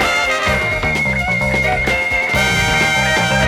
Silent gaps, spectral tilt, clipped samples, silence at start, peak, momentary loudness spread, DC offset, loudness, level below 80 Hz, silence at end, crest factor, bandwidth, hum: none; -3.5 dB/octave; under 0.1%; 0 s; -2 dBFS; 3 LU; under 0.1%; -14 LUFS; -30 dBFS; 0 s; 12 dB; 17.5 kHz; none